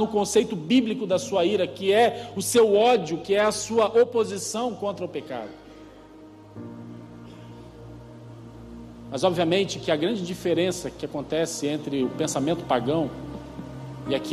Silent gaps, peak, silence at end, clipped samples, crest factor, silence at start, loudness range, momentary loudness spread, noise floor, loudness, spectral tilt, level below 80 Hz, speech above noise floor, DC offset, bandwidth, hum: none; -8 dBFS; 0 s; under 0.1%; 18 dB; 0 s; 18 LU; 23 LU; -46 dBFS; -24 LUFS; -4.5 dB/octave; -56 dBFS; 23 dB; under 0.1%; 15 kHz; none